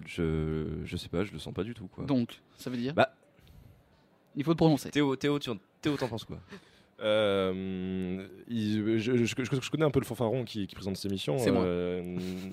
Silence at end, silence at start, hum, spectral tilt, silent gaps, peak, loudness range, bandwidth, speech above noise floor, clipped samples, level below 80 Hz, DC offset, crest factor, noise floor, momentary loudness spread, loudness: 0 s; 0 s; none; -6.5 dB/octave; none; -10 dBFS; 4 LU; 16 kHz; 33 dB; under 0.1%; -54 dBFS; under 0.1%; 20 dB; -64 dBFS; 11 LU; -31 LUFS